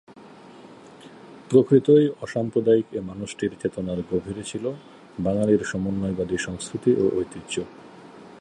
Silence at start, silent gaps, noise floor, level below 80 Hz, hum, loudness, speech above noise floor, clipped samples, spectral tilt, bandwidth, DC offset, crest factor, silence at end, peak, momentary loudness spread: 0.1 s; none; -46 dBFS; -52 dBFS; none; -24 LUFS; 23 dB; under 0.1%; -6.5 dB/octave; 11 kHz; under 0.1%; 20 dB; 0.05 s; -4 dBFS; 14 LU